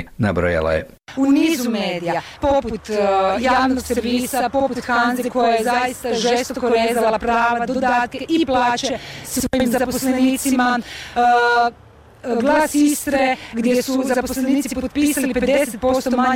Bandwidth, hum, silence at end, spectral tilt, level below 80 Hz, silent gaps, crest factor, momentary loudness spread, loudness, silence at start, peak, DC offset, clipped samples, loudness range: 17 kHz; none; 0 s; -4 dB/octave; -42 dBFS; none; 10 dB; 6 LU; -18 LUFS; 0 s; -8 dBFS; under 0.1%; under 0.1%; 1 LU